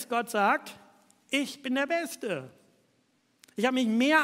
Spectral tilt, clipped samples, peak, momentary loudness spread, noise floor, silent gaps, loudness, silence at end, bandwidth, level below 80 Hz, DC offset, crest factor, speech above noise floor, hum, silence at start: -3.5 dB/octave; under 0.1%; -8 dBFS; 10 LU; -70 dBFS; none; -29 LUFS; 0 s; 16 kHz; -86 dBFS; under 0.1%; 22 dB; 43 dB; none; 0 s